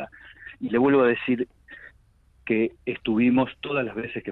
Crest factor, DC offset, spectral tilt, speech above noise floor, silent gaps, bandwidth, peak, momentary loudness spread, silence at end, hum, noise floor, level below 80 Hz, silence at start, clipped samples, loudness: 14 dB; under 0.1%; -9 dB/octave; 36 dB; none; 4.1 kHz; -12 dBFS; 23 LU; 0 s; none; -59 dBFS; -58 dBFS; 0 s; under 0.1%; -24 LUFS